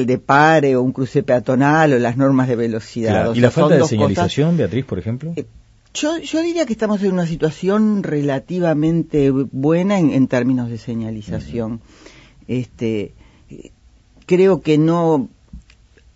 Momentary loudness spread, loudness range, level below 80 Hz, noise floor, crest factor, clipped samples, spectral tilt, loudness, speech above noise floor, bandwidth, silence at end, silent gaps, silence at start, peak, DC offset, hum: 12 LU; 7 LU; -46 dBFS; -50 dBFS; 18 dB; under 0.1%; -7 dB/octave; -17 LUFS; 33 dB; 8 kHz; 0.55 s; none; 0 s; 0 dBFS; under 0.1%; none